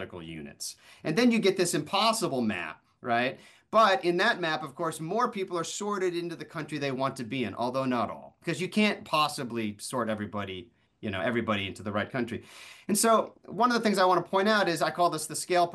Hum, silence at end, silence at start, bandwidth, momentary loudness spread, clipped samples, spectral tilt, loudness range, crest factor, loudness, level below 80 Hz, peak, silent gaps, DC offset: none; 0 s; 0 s; 12.5 kHz; 14 LU; under 0.1%; -4 dB/octave; 5 LU; 18 dB; -28 LUFS; -70 dBFS; -12 dBFS; none; under 0.1%